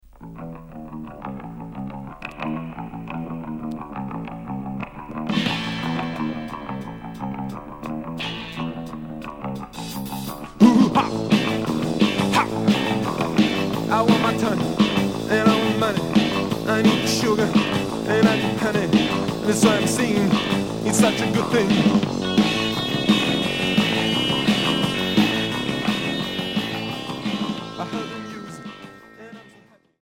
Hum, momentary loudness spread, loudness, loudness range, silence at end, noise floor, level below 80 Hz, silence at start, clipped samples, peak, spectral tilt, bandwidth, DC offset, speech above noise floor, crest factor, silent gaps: none; 16 LU; -21 LUFS; 11 LU; 0.55 s; -53 dBFS; -48 dBFS; 0.15 s; under 0.1%; -2 dBFS; -5 dB/octave; 17 kHz; under 0.1%; 35 dB; 20 dB; none